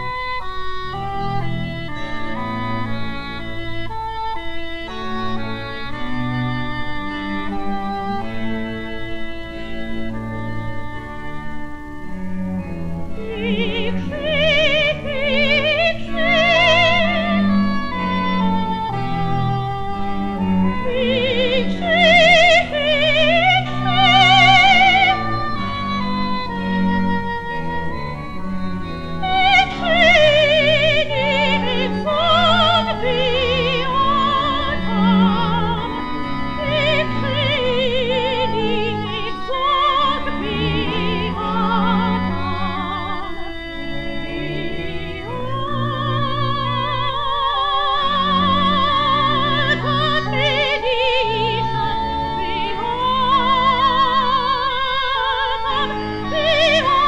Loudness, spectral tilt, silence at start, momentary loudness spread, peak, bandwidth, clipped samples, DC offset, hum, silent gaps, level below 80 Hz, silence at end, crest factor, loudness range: -18 LUFS; -5.5 dB/octave; 0 s; 15 LU; -2 dBFS; 9.4 kHz; under 0.1%; under 0.1%; none; none; -36 dBFS; 0 s; 16 dB; 12 LU